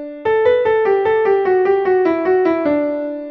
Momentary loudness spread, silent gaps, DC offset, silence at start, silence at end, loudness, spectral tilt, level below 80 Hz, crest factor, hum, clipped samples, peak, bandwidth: 4 LU; none; under 0.1%; 0 s; 0 s; -15 LUFS; -7.5 dB/octave; -54 dBFS; 12 dB; none; under 0.1%; -4 dBFS; 5.6 kHz